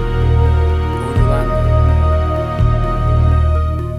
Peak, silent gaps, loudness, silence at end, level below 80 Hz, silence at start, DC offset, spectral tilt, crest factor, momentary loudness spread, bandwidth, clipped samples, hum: 0 dBFS; none; -15 LUFS; 0 s; -16 dBFS; 0 s; under 0.1%; -8.5 dB/octave; 12 dB; 4 LU; 5.2 kHz; under 0.1%; none